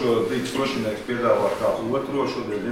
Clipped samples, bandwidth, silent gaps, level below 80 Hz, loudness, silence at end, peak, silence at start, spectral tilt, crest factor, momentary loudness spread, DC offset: under 0.1%; 16.5 kHz; none; -54 dBFS; -24 LUFS; 0 s; -8 dBFS; 0 s; -5.5 dB/octave; 16 dB; 6 LU; 0.1%